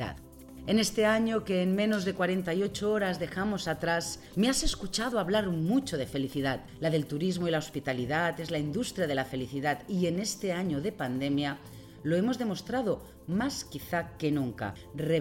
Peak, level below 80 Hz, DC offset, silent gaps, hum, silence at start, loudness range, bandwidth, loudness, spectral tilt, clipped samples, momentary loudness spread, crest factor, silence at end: -14 dBFS; -50 dBFS; under 0.1%; none; none; 0 s; 3 LU; 17 kHz; -31 LUFS; -5 dB/octave; under 0.1%; 7 LU; 16 dB; 0 s